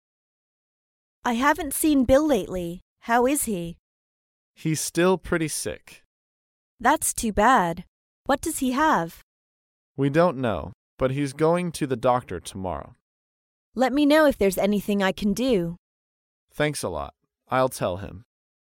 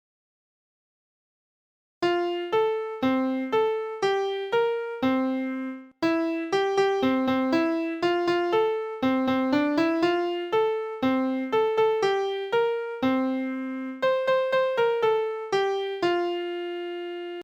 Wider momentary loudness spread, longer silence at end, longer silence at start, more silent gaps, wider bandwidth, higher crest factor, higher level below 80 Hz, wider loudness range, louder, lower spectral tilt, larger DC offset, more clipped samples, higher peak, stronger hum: first, 16 LU vs 6 LU; first, 0.45 s vs 0 s; second, 1.25 s vs 2 s; first, 2.82-2.96 s, 3.79-4.54 s, 6.05-6.78 s, 7.88-8.25 s, 9.23-9.95 s, 10.74-10.98 s, 13.01-13.73 s, 15.78-16.48 s vs none; first, 17 kHz vs 15 kHz; first, 20 dB vs 14 dB; first, -48 dBFS vs -66 dBFS; about the same, 4 LU vs 2 LU; first, -23 LUFS vs -26 LUFS; about the same, -4.5 dB/octave vs -5.5 dB/octave; neither; neither; first, -6 dBFS vs -12 dBFS; neither